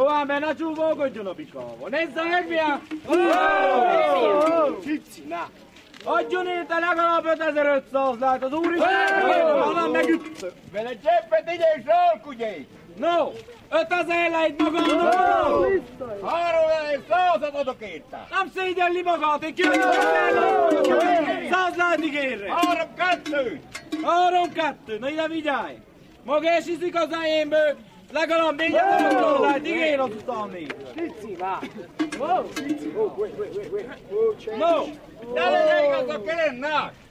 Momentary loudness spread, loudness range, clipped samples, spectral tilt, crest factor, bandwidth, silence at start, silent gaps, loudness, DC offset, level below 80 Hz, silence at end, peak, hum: 13 LU; 5 LU; under 0.1%; -4 dB/octave; 18 dB; 14 kHz; 0 s; none; -22 LUFS; under 0.1%; -60 dBFS; 0.2 s; -6 dBFS; none